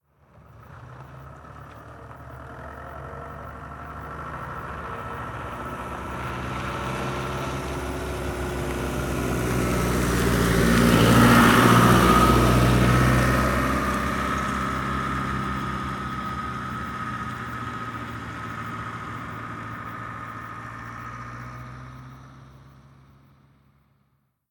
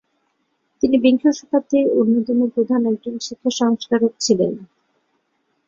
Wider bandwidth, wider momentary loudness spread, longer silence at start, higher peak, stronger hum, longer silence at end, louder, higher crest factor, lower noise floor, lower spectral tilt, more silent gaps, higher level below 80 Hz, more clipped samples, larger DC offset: first, 19.5 kHz vs 7.8 kHz; first, 23 LU vs 8 LU; second, 0.55 s vs 0.85 s; about the same, -4 dBFS vs -2 dBFS; neither; first, 1.8 s vs 1 s; second, -23 LUFS vs -18 LUFS; first, 22 dB vs 16 dB; about the same, -69 dBFS vs -69 dBFS; about the same, -5.5 dB/octave vs -5 dB/octave; neither; first, -36 dBFS vs -60 dBFS; neither; neither